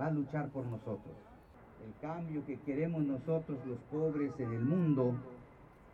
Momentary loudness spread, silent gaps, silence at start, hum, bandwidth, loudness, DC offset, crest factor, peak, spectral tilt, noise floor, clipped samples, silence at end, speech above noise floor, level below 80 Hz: 20 LU; none; 0 s; none; 6 kHz; -37 LUFS; under 0.1%; 16 dB; -22 dBFS; -10.5 dB/octave; -58 dBFS; under 0.1%; 0 s; 22 dB; -66 dBFS